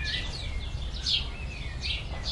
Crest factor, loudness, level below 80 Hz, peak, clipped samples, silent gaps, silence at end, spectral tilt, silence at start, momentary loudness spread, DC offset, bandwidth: 18 dB; -32 LUFS; -36 dBFS; -14 dBFS; under 0.1%; none; 0 s; -3 dB/octave; 0 s; 9 LU; under 0.1%; 11.5 kHz